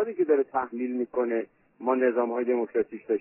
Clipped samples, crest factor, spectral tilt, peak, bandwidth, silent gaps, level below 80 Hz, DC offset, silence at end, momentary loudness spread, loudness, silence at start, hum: under 0.1%; 16 dB; -10 dB/octave; -12 dBFS; 3 kHz; none; -74 dBFS; under 0.1%; 0 s; 7 LU; -27 LUFS; 0 s; none